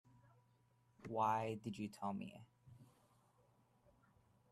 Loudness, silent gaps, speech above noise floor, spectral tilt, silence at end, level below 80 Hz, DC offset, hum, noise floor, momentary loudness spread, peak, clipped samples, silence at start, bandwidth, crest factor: -43 LUFS; none; 33 dB; -6.5 dB/octave; 1.65 s; -80 dBFS; under 0.1%; none; -76 dBFS; 18 LU; -26 dBFS; under 0.1%; 1 s; 13.5 kHz; 20 dB